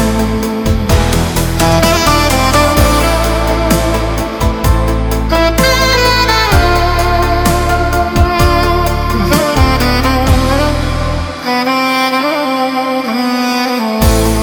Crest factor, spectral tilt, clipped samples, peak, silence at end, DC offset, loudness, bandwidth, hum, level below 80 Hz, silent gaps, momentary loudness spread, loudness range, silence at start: 10 dB; -5 dB/octave; under 0.1%; 0 dBFS; 0 s; under 0.1%; -12 LUFS; over 20 kHz; none; -16 dBFS; none; 6 LU; 2 LU; 0 s